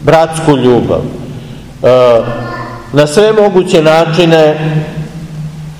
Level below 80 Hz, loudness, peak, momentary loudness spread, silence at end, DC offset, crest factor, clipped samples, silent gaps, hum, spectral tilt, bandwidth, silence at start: -36 dBFS; -9 LUFS; 0 dBFS; 16 LU; 0 s; 0.4%; 10 dB; 4%; none; none; -6 dB/octave; 15.5 kHz; 0 s